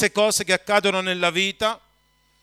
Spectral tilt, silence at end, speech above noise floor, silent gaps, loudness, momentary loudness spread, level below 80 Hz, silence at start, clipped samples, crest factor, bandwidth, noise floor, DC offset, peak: -2.5 dB/octave; 0.65 s; 42 dB; none; -21 LUFS; 6 LU; -60 dBFS; 0 s; under 0.1%; 18 dB; 15.5 kHz; -63 dBFS; under 0.1%; -4 dBFS